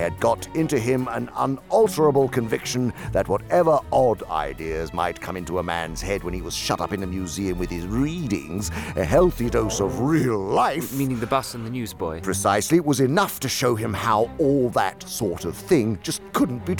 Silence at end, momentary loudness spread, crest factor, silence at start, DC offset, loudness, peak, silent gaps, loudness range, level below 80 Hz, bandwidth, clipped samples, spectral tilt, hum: 0 s; 9 LU; 16 dB; 0 s; 0.1%; -23 LUFS; -6 dBFS; none; 5 LU; -40 dBFS; 19.5 kHz; under 0.1%; -5.5 dB/octave; none